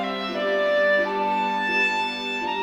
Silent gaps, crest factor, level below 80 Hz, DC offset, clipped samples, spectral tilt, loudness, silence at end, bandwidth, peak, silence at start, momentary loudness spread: none; 14 dB; -62 dBFS; under 0.1%; under 0.1%; -4 dB/octave; -22 LUFS; 0 s; 11 kHz; -10 dBFS; 0 s; 6 LU